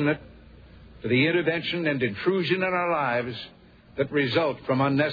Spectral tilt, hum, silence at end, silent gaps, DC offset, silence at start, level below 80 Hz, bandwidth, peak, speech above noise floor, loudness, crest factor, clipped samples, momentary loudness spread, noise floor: -8 dB/octave; none; 0 s; none; under 0.1%; 0 s; -56 dBFS; 5 kHz; -10 dBFS; 24 dB; -25 LUFS; 16 dB; under 0.1%; 12 LU; -48 dBFS